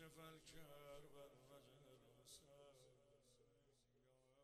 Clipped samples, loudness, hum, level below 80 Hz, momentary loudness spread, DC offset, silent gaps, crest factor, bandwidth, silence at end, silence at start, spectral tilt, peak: under 0.1%; -65 LUFS; none; -80 dBFS; 7 LU; under 0.1%; none; 18 dB; 13.5 kHz; 0 s; 0 s; -3.5 dB/octave; -48 dBFS